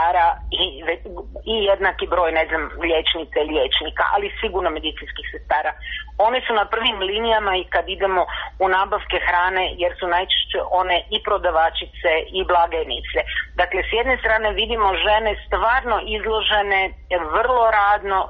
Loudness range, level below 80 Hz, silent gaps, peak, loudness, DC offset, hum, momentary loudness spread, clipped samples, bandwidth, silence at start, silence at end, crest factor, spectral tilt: 2 LU; -38 dBFS; none; -6 dBFS; -20 LUFS; under 0.1%; none; 6 LU; under 0.1%; 5.4 kHz; 0 s; 0 s; 14 dB; 0 dB/octave